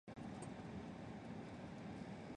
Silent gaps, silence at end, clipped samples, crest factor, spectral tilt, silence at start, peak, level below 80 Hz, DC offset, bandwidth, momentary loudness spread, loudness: none; 0 s; under 0.1%; 12 dB; -6.5 dB/octave; 0.05 s; -38 dBFS; -68 dBFS; under 0.1%; 10.5 kHz; 2 LU; -52 LUFS